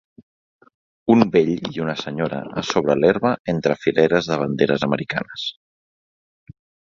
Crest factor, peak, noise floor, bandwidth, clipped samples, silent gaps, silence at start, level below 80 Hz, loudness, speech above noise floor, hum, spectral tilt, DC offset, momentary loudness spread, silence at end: 20 dB; 0 dBFS; under -90 dBFS; 7.4 kHz; under 0.1%; 3.39-3.45 s; 1.05 s; -56 dBFS; -20 LUFS; over 71 dB; none; -6 dB/octave; under 0.1%; 9 LU; 1.35 s